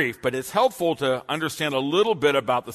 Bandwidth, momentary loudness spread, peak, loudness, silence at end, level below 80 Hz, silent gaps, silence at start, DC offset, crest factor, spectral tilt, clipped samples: 13.5 kHz; 5 LU; -8 dBFS; -23 LUFS; 0 s; -62 dBFS; none; 0 s; under 0.1%; 16 dB; -4.5 dB/octave; under 0.1%